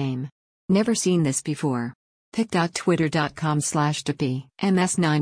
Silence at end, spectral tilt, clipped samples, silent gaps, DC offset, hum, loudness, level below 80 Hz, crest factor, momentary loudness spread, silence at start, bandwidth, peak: 0 s; -5 dB/octave; under 0.1%; 0.32-0.68 s, 1.95-2.32 s; under 0.1%; none; -24 LUFS; -60 dBFS; 14 dB; 9 LU; 0 s; 10.5 kHz; -10 dBFS